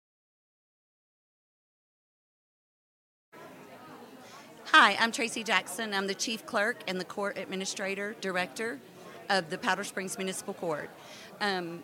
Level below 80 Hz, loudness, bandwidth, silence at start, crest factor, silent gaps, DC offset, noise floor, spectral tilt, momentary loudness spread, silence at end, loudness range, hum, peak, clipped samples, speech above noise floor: -82 dBFS; -29 LUFS; 17 kHz; 3.35 s; 28 dB; none; under 0.1%; -50 dBFS; -2.5 dB/octave; 25 LU; 0 s; 6 LU; none; -6 dBFS; under 0.1%; 20 dB